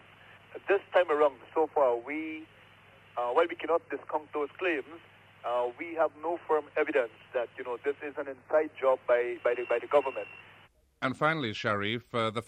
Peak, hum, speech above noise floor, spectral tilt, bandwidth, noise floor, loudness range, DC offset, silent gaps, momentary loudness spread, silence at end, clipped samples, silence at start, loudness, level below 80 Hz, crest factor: -12 dBFS; none; 30 dB; -6 dB/octave; 9.6 kHz; -60 dBFS; 3 LU; under 0.1%; none; 11 LU; 0.05 s; under 0.1%; 0.3 s; -30 LUFS; -74 dBFS; 20 dB